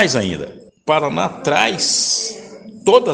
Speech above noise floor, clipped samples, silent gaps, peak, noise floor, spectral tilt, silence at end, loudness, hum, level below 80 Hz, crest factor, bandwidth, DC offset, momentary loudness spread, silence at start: 20 dB; under 0.1%; none; 0 dBFS; -36 dBFS; -2.5 dB/octave; 0 s; -17 LUFS; none; -54 dBFS; 18 dB; 10.5 kHz; under 0.1%; 16 LU; 0 s